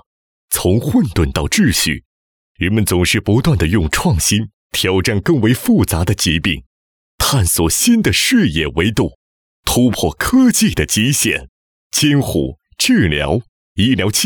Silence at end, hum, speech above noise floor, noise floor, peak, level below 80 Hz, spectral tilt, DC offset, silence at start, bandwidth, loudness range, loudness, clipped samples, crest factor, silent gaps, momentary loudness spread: 0 s; none; over 76 dB; under -90 dBFS; -4 dBFS; -30 dBFS; -4 dB/octave; under 0.1%; 0.5 s; over 20 kHz; 2 LU; -15 LUFS; under 0.1%; 12 dB; 2.05-2.55 s, 4.53-4.70 s, 6.66-7.18 s, 9.15-9.63 s, 11.49-11.90 s, 13.49-13.76 s; 8 LU